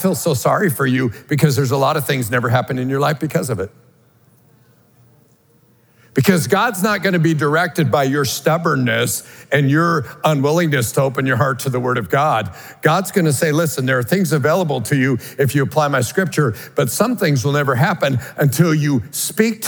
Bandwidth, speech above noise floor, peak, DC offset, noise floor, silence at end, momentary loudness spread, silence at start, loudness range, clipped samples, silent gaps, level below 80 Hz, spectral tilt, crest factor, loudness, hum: over 20 kHz; 37 dB; 0 dBFS; under 0.1%; -54 dBFS; 0 s; 4 LU; 0 s; 5 LU; under 0.1%; none; -60 dBFS; -5.5 dB/octave; 18 dB; -17 LUFS; none